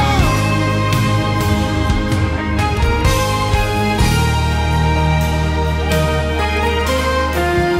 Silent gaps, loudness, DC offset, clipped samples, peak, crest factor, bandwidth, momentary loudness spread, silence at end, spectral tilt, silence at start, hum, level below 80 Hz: none; -16 LUFS; under 0.1%; under 0.1%; -4 dBFS; 12 dB; 16 kHz; 3 LU; 0 s; -5.5 dB/octave; 0 s; none; -22 dBFS